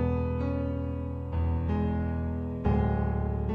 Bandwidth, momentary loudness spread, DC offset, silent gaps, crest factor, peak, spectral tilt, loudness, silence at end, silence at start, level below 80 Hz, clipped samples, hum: 4.5 kHz; 6 LU; under 0.1%; none; 16 dB; -12 dBFS; -11 dB/octave; -30 LUFS; 0 s; 0 s; -34 dBFS; under 0.1%; none